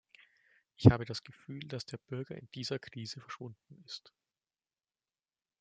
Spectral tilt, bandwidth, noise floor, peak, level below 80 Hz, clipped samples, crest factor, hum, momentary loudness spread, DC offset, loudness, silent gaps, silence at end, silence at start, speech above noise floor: -7 dB/octave; 8.8 kHz; under -90 dBFS; -6 dBFS; -58 dBFS; under 0.1%; 30 dB; none; 21 LU; under 0.1%; -34 LUFS; none; 1.6 s; 0.8 s; over 56 dB